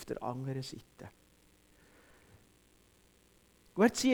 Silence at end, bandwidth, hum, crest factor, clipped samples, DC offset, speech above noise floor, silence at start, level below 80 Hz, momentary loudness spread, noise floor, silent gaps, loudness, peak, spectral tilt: 0 s; 19.5 kHz; none; 22 dB; under 0.1%; under 0.1%; 33 dB; 0 s; -68 dBFS; 25 LU; -66 dBFS; none; -34 LUFS; -14 dBFS; -5 dB/octave